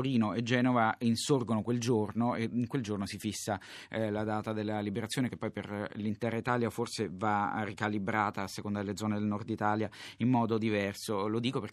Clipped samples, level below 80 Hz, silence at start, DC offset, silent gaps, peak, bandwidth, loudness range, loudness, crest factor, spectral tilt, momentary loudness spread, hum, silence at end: under 0.1%; -70 dBFS; 0 s; under 0.1%; none; -14 dBFS; 14 kHz; 4 LU; -33 LUFS; 18 dB; -5.5 dB/octave; 7 LU; none; 0 s